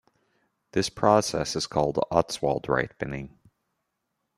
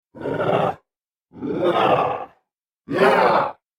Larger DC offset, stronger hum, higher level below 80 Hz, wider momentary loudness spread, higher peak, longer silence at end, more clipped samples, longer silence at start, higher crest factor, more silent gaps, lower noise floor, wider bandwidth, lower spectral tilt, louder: neither; neither; first, -54 dBFS vs -60 dBFS; about the same, 13 LU vs 15 LU; about the same, -4 dBFS vs -4 dBFS; first, 1.1 s vs 0.25 s; neither; first, 0.75 s vs 0.15 s; first, 24 dB vs 18 dB; neither; about the same, -80 dBFS vs -82 dBFS; second, 15 kHz vs 17 kHz; second, -4.5 dB/octave vs -6.5 dB/octave; second, -26 LUFS vs -20 LUFS